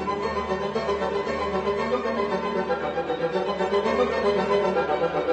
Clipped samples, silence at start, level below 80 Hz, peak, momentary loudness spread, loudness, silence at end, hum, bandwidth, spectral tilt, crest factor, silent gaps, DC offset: under 0.1%; 0 s; -48 dBFS; -10 dBFS; 4 LU; -25 LUFS; 0 s; none; 8.6 kHz; -6 dB/octave; 14 dB; none; under 0.1%